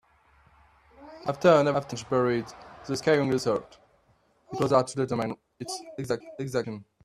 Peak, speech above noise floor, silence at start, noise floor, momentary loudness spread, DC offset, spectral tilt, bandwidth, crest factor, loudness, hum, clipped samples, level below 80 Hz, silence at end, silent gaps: -6 dBFS; 39 dB; 1 s; -66 dBFS; 15 LU; under 0.1%; -5.5 dB/octave; 13.5 kHz; 22 dB; -27 LUFS; none; under 0.1%; -64 dBFS; 0.25 s; none